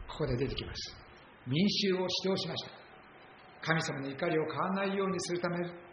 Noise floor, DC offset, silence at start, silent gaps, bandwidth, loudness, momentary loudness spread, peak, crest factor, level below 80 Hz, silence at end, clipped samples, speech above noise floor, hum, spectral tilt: -55 dBFS; under 0.1%; 0 s; none; 6.8 kHz; -33 LUFS; 14 LU; -12 dBFS; 22 dB; -56 dBFS; 0 s; under 0.1%; 22 dB; none; -4 dB/octave